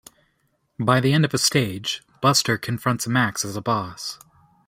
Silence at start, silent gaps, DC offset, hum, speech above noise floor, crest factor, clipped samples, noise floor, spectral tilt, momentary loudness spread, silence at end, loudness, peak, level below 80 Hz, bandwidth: 0.8 s; none; under 0.1%; none; 47 dB; 20 dB; under 0.1%; -69 dBFS; -4 dB/octave; 11 LU; 0.5 s; -21 LUFS; -2 dBFS; -60 dBFS; 16 kHz